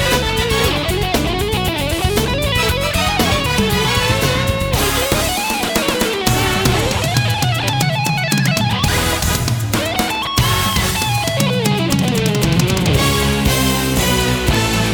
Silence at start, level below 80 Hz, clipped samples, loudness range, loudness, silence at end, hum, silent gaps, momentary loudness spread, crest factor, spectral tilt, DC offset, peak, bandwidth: 0 s; -26 dBFS; under 0.1%; 1 LU; -16 LUFS; 0 s; none; none; 3 LU; 16 dB; -4 dB/octave; under 0.1%; 0 dBFS; over 20 kHz